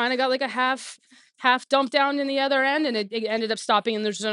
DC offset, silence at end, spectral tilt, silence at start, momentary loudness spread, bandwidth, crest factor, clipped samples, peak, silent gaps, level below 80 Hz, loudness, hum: under 0.1%; 0 s; -3 dB/octave; 0 s; 6 LU; 11.5 kHz; 20 dB; under 0.1%; -4 dBFS; none; -82 dBFS; -23 LUFS; none